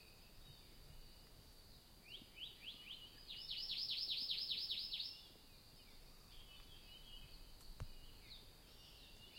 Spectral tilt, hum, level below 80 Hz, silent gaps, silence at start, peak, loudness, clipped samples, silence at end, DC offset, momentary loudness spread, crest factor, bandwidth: -2 dB/octave; none; -64 dBFS; none; 0 s; -28 dBFS; -46 LUFS; under 0.1%; 0 s; under 0.1%; 22 LU; 22 dB; 16.5 kHz